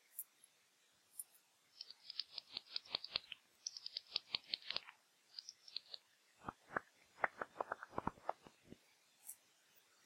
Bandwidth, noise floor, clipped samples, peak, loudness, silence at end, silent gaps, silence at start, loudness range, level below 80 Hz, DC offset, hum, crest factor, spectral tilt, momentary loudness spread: 16 kHz; -75 dBFS; under 0.1%; -20 dBFS; -47 LUFS; 0.25 s; none; 0.15 s; 3 LU; -80 dBFS; under 0.1%; none; 30 dB; -1.5 dB/octave; 16 LU